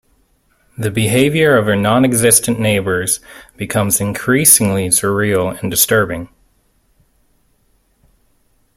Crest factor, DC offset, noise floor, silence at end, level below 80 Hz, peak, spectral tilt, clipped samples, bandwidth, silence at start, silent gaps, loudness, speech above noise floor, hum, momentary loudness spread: 16 dB; under 0.1%; -58 dBFS; 2.5 s; -48 dBFS; 0 dBFS; -4 dB/octave; under 0.1%; 16.5 kHz; 0.8 s; none; -13 LUFS; 44 dB; none; 11 LU